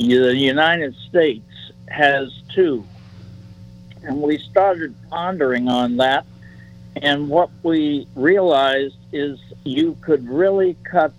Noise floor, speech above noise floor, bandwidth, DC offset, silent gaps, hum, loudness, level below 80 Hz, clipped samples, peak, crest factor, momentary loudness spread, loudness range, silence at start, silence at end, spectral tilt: -41 dBFS; 23 dB; 10.5 kHz; under 0.1%; none; none; -18 LUFS; -54 dBFS; under 0.1%; -2 dBFS; 16 dB; 12 LU; 3 LU; 0 s; 0.05 s; -6.5 dB/octave